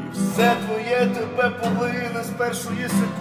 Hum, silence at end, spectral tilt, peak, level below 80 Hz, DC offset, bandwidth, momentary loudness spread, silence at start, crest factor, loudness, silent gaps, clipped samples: none; 0 s; -5 dB/octave; -6 dBFS; -56 dBFS; under 0.1%; 16 kHz; 6 LU; 0 s; 18 dB; -22 LUFS; none; under 0.1%